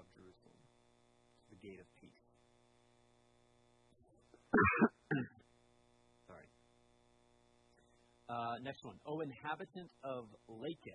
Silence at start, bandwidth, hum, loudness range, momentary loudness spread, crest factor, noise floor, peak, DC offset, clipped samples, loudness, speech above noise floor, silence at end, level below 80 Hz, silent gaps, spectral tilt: 0 s; 10 kHz; none; 12 LU; 27 LU; 26 dB; -72 dBFS; -18 dBFS; under 0.1%; under 0.1%; -39 LUFS; 32 dB; 0 s; -72 dBFS; none; -7.5 dB/octave